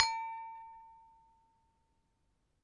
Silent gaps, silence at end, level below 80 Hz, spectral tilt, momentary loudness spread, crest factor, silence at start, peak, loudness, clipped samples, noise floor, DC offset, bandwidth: none; 1.55 s; -74 dBFS; 2 dB/octave; 23 LU; 34 dB; 0 s; -8 dBFS; -39 LUFS; under 0.1%; -78 dBFS; under 0.1%; 11 kHz